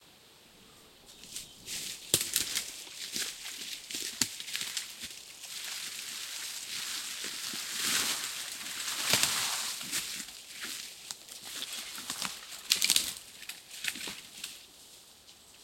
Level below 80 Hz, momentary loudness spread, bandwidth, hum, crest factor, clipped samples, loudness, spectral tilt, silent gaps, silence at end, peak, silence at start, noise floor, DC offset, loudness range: -70 dBFS; 15 LU; 17 kHz; none; 34 dB; under 0.1%; -33 LUFS; 0.5 dB/octave; none; 0 s; -4 dBFS; 0 s; -58 dBFS; under 0.1%; 5 LU